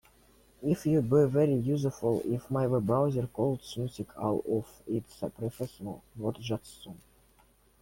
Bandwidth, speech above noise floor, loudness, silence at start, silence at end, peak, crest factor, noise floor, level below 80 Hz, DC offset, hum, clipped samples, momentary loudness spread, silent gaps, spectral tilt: 16.5 kHz; 34 dB; -31 LUFS; 0.6 s; 0.85 s; -14 dBFS; 18 dB; -64 dBFS; -60 dBFS; under 0.1%; none; under 0.1%; 13 LU; none; -8 dB/octave